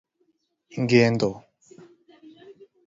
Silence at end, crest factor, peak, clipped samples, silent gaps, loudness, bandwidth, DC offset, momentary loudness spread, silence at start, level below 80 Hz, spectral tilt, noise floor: 0.35 s; 22 dB; -6 dBFS; under 0.1%; none; -22 LUFS; 7.8 kHz; under 0.1%; 21 LU; 0.75 s; -62 dBFS; -6.5 dB/octave; -70 dBFS